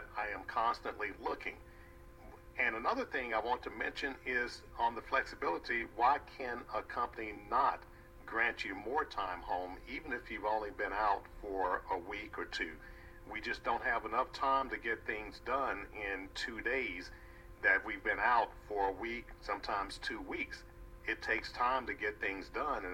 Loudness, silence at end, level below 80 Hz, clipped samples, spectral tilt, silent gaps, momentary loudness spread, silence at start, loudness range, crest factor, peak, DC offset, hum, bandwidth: -37 LUFS; 0 s; -56 dBFS; under 0.1%; -4 dB/octave; none; 11 LU; 0 s; 3 LU; 22 dB; -16 dBFS; under 0.1%; none; 17 kHz